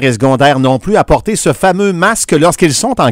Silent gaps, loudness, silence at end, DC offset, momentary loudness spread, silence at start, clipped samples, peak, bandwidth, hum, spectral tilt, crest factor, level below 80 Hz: none; -10 LUFS; 0 s; under 0.1%; 3 LU; 0 s; 0.6%; 0 dBFS; 16.5 kHz; none; -4.5 dB/octave; 10 dB; -30 dBFS